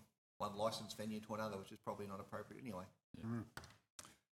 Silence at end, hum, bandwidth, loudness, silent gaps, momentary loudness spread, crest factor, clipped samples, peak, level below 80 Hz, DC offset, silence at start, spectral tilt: 0.25 s; none; 17 kHz; -48 LUFS; 0.18-0.40 s, 3.04-3.14 s, 3.90-3.99 s; 16 LU; 20 dB; under 0.1%; -28 dBFS; -78 dBFS; under 0.1%; 0 s; -5 dB/octave